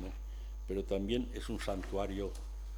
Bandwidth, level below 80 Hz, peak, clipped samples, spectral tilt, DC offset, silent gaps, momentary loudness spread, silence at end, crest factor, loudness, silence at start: 19.5 kHz; -42 dBFS; -20 dBFS; under 0.1%; -6 dB/octave; under 0.1%; none; 11 LU; 0 s; 18 dB; -39 LUFS; 0 s